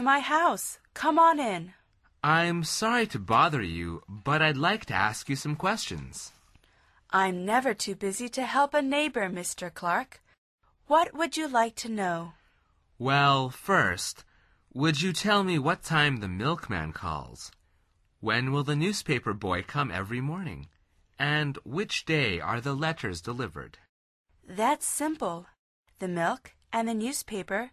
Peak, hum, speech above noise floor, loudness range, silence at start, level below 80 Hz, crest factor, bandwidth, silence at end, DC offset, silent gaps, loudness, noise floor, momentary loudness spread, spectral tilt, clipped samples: -8 dBFS; none; 40 dB; 5 LU; 0 s; -54 dBFS; 20 dB; 13.5 kHz; 0.05 s; under 0.1%; 10.38-10.58 s, 23.89-24.25 s, 25.59-25.83 s; -28 LUFS; -68 dBFS; 13 LU; -4.5 dB/octave; under 0.1%